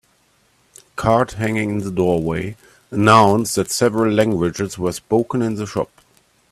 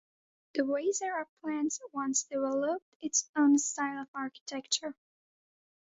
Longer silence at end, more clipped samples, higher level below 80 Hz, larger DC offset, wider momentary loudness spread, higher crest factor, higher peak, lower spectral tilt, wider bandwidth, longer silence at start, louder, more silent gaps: second, 0.65 s vs 1 s; neither; first, -48 dBFS vs -80 dBFS; neither; about the same, 13 LU vs 12 LU; about the same, 18 dB vs 18 dB; first, 0 dBFS vs -16 dBFS; first, -5.5 dB/octave vs -1.5 dB/octave; first, 15 kHz vs 8 kHz; first, 0.95 s vs 0.55 s; first, -18 LUFS vs -32 LUFS; second, none vs 1.29-1.37 s, 2.82-3.00 s, 3.29-3.34 s, 4.08-4.14 s, 4.41-4.46 s